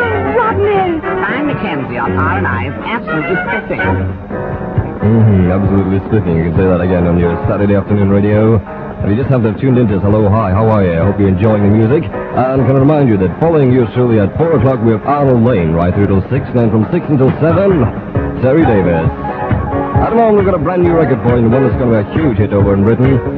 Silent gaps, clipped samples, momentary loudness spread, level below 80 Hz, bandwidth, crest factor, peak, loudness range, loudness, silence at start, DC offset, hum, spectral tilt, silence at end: none; under 0.1%; 7 LU; -30 dBFS; 4.5 kHz; 12 dB; 0 dBFS; 3 LU; -12 LUFS; 0 s; under 0.1%; none; -11 dB/octave; 0 s